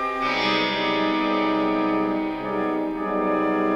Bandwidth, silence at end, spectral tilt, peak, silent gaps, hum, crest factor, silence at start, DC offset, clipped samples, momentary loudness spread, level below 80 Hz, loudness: 7.6 kHz; 0 s; -5.5 dB/octave; -10 dBFS; none; none; 12 dB; 0 s; under 0.1%; under 0.1%; 5 LU; -52 dBFS; -23 LUFS